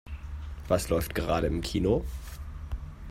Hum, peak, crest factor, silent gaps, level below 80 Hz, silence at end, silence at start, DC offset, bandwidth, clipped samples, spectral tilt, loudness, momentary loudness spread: none; -10 dBFS; 20 dB; none; -38 dBFS; 0 s; 0.05 s; under 0.1%; 16 kHz; under 0.1%; -6 dB/octave; -30 LUFS; 14 LU